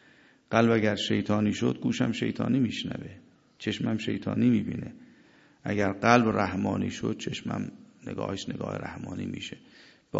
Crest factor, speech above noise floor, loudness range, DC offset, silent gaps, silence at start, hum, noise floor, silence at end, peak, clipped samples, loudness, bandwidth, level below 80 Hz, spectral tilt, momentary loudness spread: 26 dB; 31 dB; 5 LU; under 0.1%; none; 0.5 s; none; -59 dBFS; 0 s; -4 dBFS; under 0.1%; -28 LUFS; 8 kHz; -56 dBFS; -6 dB/octave; 16 LU